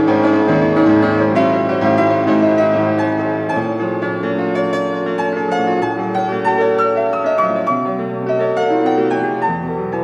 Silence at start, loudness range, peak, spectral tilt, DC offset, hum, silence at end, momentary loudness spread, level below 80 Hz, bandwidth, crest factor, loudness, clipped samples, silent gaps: 0 s; 4 LU; -2 dBFS; -7.5 dB/octave; under 0.1%; none; 0 s; 6 LU; -56 dBFS; 8.2 kHz; 14 dB; -16 LUFS; under 0.1%; none